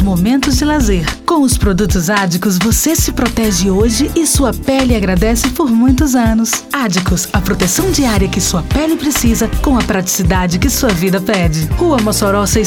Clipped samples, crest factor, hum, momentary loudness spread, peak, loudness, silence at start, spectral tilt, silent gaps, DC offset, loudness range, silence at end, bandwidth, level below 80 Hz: under 0.1%; 12 dB; none; 3 LU; 0 dBFS; -13 LUFS; 0 s; -4.5 dB/octave; none; under 0.1%; 1 LU; 0 s; 19 kHz; -20 dBFS